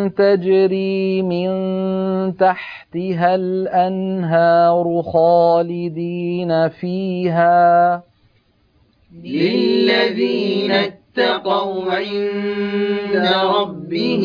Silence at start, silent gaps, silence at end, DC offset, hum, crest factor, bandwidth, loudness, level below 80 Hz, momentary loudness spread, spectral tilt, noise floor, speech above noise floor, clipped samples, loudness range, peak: 0 s; none; 0 s; under 0.1%; none; 14 dB; 5.2 kHz; -17 LUFS; -60 dBFS; 9 LU; -8 dB/octave; -58 dBFS; 41 dB; under 0.1%; 3 LU; -4 dBFS